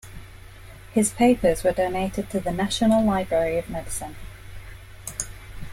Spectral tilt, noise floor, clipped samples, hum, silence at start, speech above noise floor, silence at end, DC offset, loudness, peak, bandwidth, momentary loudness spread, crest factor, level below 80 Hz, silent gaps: -5 dB/octave; -43 dBFS; under 0.1%; none; 0.05 s; 21 dB; 0 s; under 0.1%; -23 LUFS; -6 dBFS; 16.5 kHz; 23 LU; 18 dB; -42 dBFS; none